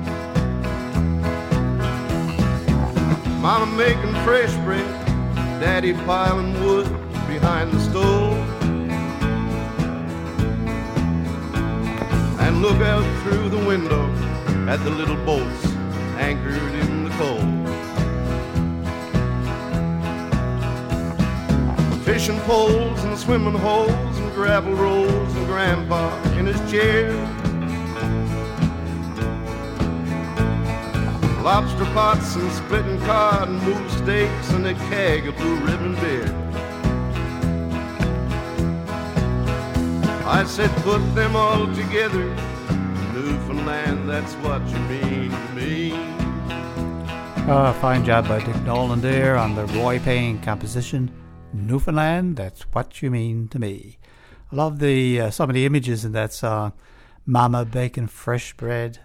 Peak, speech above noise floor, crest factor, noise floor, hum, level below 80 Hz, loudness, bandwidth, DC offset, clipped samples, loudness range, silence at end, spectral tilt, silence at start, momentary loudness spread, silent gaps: -4 dBFS; 25 dB; 18 dB; -45 dBFS; none; -32 dBFS; -22 LUFS; 16.5 kHz; under 0.1%; under 0.1%; 4 LU; 0.05 s; -6.5 dB/octave; 0 s; 8 LU; none